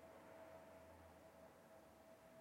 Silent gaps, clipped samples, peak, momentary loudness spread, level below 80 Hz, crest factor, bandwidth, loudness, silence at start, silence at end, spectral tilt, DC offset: none; under 0.1%; -50 dBFS; 5 LU; -80 dBFS; 12 dB; 16.5 kHz; -64 LUFS; 0 s; 0 s; -5 dB/octave; under 0.1%